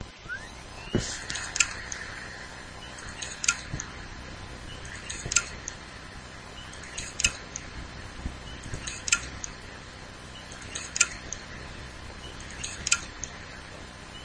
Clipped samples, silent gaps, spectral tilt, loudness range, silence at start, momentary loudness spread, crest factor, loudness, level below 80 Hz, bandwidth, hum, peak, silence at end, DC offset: under 0.1%; none; -1.5 dB/octave; 3 LU; 0 s; 16 LU; 34 dB; -32 LUFS; -46 dBFS; 11 kHz; none; -2 dBFS; 0 s; under 0.1%